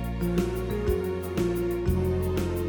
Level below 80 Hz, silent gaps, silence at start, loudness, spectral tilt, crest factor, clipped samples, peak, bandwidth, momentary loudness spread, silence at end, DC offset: -36 dBFS; none; 0 s; -28 LUFS; -7.5 dB/octave; 14 dB; under 0.1%; -12 dBFS; 19 kHz; 2 LU; 0 s; under 0.1%